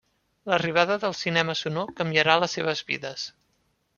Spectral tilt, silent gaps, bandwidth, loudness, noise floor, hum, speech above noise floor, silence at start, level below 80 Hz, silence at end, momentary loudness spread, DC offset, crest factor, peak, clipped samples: -4 dB/octave; none; 7.4 kHz; -24 LUFS; -71 dBFS; none; 45 dB; 0.45 s; -66 dBFS; 0.7 s; 13 LU; under 0.1%; 24 dB; -2 dBFS; under 0.1%